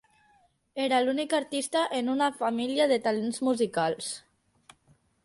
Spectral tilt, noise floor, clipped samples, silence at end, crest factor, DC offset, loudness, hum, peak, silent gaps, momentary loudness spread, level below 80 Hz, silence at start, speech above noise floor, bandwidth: -3.5 dB/octave; -66 dBFS; under 0.1%; 1.05 s; 16 dB; under 0.1%; -28 LUFS; none; -12 dBFS; none; 8 LU; -74 dBFS; 0.75 s; 38 dB; 11.5 kHz